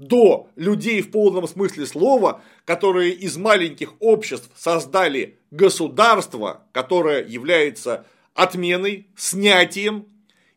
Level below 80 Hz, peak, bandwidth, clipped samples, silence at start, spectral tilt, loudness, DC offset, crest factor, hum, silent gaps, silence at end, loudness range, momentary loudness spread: -72 dBFS; 0 dBFS; 16.5 kHz; under 0.1%; 0 s; -3.5 dB/octave; -19 LUFS; under 0.1%; 18 dB; none; none; 0.55 s; 2 LU; 12 LU